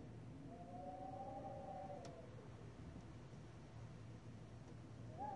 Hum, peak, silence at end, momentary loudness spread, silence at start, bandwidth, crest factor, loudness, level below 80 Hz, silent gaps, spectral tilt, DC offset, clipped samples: none; -38 dBFS; 0 s; 6 LU; 0 s; 10.5 kHz; 16 dB; -55 LUFS; -68 dBFS; none; -7 dB/octave; under 0.1%; under 0.1%